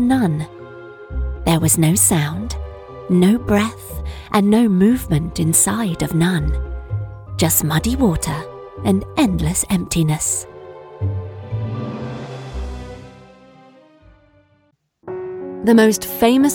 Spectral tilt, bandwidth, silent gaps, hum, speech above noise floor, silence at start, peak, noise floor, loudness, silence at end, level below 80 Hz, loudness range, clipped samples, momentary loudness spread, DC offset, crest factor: -5 dB/octave; 18 kHz; none; none; 45 dB; 0 s; -2 dBFS; -61 dBFS; -17 LUFS; 0 s; -32 dBFS; 14 LU; under 0.1%; 17 LU; under 0.1%; 16 dB